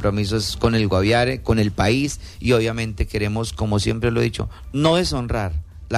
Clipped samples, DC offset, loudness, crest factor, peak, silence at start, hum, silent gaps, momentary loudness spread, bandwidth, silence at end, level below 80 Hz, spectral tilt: under 0.1%; under 0.1%; -21 LUFS; 14 dB; -6 dBFS; 0 s; none; none; 8 LU; 14 kHz; 0 s; -32 dBFS; -5.5 dB/octave